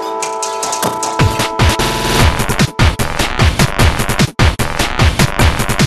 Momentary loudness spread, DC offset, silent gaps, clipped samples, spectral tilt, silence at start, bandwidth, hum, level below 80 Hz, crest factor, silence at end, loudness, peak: 4 LU; 2%; none; under 0.1%; -4 dB/octave; 0 s; 13.5 kHz; none; -20 dBFS; 14 dB; 0 s; -13 LUFS; 0 dBFS